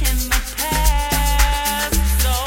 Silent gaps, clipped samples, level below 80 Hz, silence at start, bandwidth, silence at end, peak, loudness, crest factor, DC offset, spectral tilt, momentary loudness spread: none; under 0.1%; -20 dBFS; 0 s; 16.5 kHz; 0 s; 0 dBFS; -18 LUFS; 18 dB; under 0.1%; -3 dB/octave; 3 LU